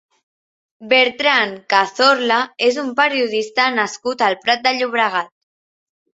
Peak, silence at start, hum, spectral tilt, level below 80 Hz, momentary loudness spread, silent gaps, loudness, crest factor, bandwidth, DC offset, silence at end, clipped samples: 0 dBFS; 0.8 s; none; -2 dB/octave; -68 dBFS; 6 LU; none; -16 LUFS; 18 dB; 8 kHz; under 0.1%; 0.85 s; under 0.1%